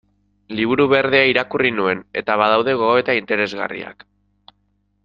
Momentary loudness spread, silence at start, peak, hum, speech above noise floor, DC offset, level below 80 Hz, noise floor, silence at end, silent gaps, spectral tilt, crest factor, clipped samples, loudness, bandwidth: 12 LU; 0.5 s; -2 dBFS; 50 Hz at -45 dBFS; 48 dB; under 0.1%; -58 dBFS; -65 dBFS; 1.15 s; none; -6.5 dB/octave; 18 dB; under 0.1%; -17 LUFS; 7.2 kHz